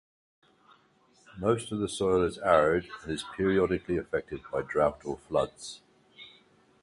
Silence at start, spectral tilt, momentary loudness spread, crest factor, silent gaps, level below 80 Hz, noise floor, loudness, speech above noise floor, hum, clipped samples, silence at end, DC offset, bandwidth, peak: 1.35 s; -5.5 dB/octave; 19 LU; 22 dB; none; -54 dBFS; -64 dBFS; -29 LUFS; 36 dB; none; under 0.1%; 0.55 s; under 0.1%; 11.5 kHz; -8 dBFS